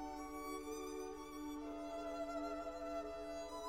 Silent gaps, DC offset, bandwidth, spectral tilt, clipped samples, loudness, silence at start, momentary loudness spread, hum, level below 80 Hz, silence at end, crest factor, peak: none; under 0.1%; 16.5 kHz; -4 dB/octave; under 0.1%; -47 LUFS; 0 s; 4 LU; none; -64 dBFS; 0 s; 12 dB; -34 dBFS